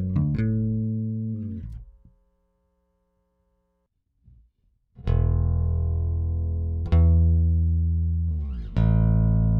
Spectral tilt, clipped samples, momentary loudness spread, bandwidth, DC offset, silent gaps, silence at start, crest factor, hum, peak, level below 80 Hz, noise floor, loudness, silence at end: -11.5 dB/octave; under 0.1%; 11 LU; 3.9 kHz; under 0.1%; none; 0 s; 14 dB; none; -10 dBFS; -28 dBFS; -74 dBFS; -24 LUFS; 0 s